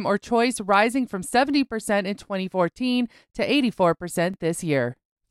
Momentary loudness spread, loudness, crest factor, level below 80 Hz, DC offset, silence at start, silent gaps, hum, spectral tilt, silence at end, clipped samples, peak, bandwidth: 8 LU; -23 LUFS; 18 dB; -58 dBFS; under 0.1%; 0 s; none; none; -5 dB/octave; 0.4 s; under 0.1%; -6 dBFS; 14.5 kHz